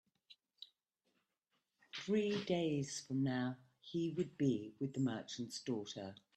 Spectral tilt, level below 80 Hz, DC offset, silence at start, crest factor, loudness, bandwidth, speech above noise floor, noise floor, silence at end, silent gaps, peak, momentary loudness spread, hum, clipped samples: -5.5 dB/octave; -80 dBFS; under 0.1%; 0.3 s; 18 dB; -40 LUFS; 12.5 kHz; 46 dB; -86 dBFS; 0.2 s; none; -24 dBFS; 14 LU; none; under 0.1%